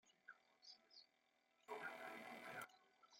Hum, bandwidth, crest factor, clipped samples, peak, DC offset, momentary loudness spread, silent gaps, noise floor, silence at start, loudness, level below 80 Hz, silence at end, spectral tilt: none; 16.5 kHz; 20 dB; under 0.1%; -40 dBFS; under 0.1%; 13 LU; none; -83 dBFS; 0.05 s; -57 LUFS; under -90 dBFS; 0 s; -2.5 dB/octave